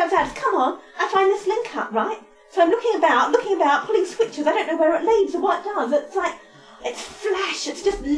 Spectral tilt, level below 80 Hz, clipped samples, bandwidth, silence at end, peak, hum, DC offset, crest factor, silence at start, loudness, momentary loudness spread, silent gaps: -3 dB/octave; -50 dBFS; under 0.1%; 11 kHz; 0 s; -4 dBFS; none; under 0.1%; 16 dB; 0 s; -21 LUFS; 10 LU; none